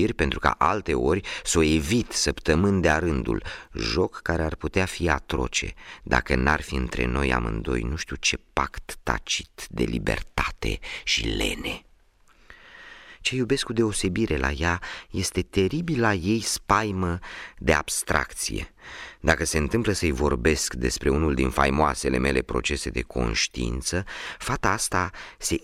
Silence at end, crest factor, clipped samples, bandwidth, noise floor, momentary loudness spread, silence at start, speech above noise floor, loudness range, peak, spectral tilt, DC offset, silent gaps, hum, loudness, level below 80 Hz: 0.05 s; 22 dB; under 0.1%; 16 kHz; -57 dBFS; 9 LU; 0 s; 32 dB; 4 LU; -4 dBFS; -4 dB/octave; under 0.1%; none; none; -25 LUFS; -36 dBFS